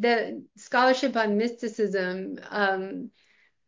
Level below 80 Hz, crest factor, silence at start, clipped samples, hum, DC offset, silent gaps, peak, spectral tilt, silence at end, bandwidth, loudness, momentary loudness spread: -76 dBFS; 18 dB; 0 s; under 0.1%; none; under 0.1%; none; -8 dBFS; -5 dB/octave; 0.6 s; 7.6 kHz; -26 LUFS; 14 LU